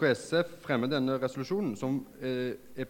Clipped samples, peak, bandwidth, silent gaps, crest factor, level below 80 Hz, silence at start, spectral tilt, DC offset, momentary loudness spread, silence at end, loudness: under 0.1%; -14 dBFS; 17 kHz; none; 18 dB; -66 dBFS; 0 s; -6 dB/octave; under 0.1%; 6 LU; 0 s; -32 LUFS